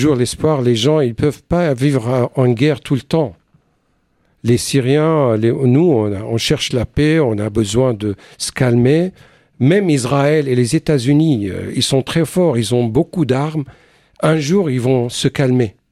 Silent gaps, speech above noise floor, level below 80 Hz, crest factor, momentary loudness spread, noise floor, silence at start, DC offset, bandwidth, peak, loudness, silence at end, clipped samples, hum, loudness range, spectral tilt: none; 47 dB; -42 dBFS; 14 dB; 6 LU; -61 dBFS; 0 s; under 0.1%; 14.5 kHz; 0 dBFS; -15 LUFS; 0.2 s; under 0.1%; none; 2 LU; -6 dB/octave